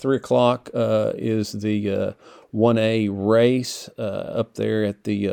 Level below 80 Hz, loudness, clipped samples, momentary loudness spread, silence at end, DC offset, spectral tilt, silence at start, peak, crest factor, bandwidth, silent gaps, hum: -64 dBFS; -22 LUFS; under 0.1%; 11 LU; 0 s; under 0.1%; -6.5 dB/octave; 0 s; -4 dBFS; 18 dB; 19 kHz; none; none